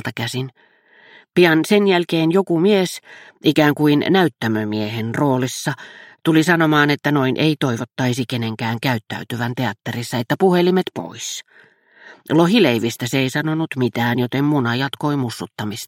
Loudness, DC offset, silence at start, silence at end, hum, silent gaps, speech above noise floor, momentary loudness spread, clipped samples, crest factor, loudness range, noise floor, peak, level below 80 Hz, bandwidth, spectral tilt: -18 LUFS; under 0.1%; 0.05 s; 0 s; none; none; 30 dB; 12 LU; under 0.1%; 18 dB; 4 LU; -48 dBFS; -2 dBFS; -62 dBFS; 16.5 kHz; -5.5 dB/octave